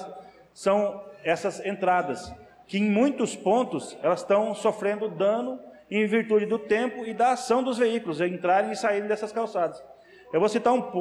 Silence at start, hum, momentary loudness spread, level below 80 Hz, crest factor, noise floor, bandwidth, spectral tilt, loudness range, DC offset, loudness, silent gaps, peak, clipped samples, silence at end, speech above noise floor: 0 s; none; 8 LU; -66 dBFS; 14 dB; -46 dBFS; 12 kHz; -5.5 dB/octave; 2 LU; under 0.1%; -26 LUFS; none; -12 dBFS; under 0.1%; 0 s; 21 dB